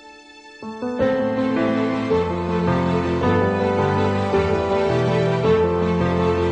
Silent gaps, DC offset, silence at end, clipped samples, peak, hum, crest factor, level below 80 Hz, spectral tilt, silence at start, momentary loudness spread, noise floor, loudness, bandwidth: none; under 0.1%; 0 s; under 0.1%; -6 dBFS; none; 14 dB; -42 dBFS; -7.5 dB/octave; 0.05 s; 4 LU; -43 dBFS; -20 LUFS; 9 kHz